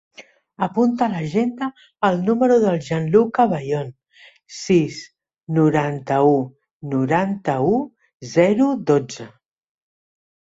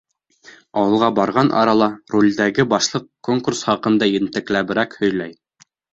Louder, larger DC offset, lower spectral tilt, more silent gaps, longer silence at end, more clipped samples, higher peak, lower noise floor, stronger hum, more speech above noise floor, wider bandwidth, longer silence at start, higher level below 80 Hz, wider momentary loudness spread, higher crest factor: about the same, -19 LUFS vs -18 LUFS; neither; first, -7 dB/octave vs -5 dB/octave; first, 6.71-6.80 s, 8.14-8.20 s vs none; first, 1.15 s vs 0.6 s; neither; about the same, -2 dBFS vs -2 dBFS; second, -51 dBFS vs -56 dBFS; neither; second, 32 dB vs 39 dB; about the same, 8 kHz vs 8 kHz; second, 0.2 s vs 0.75 s; about the same, -60 dBFS vs -56 dBFS; first, 17 LU vs 6 LU; about the same, 18 dB vs 16 dB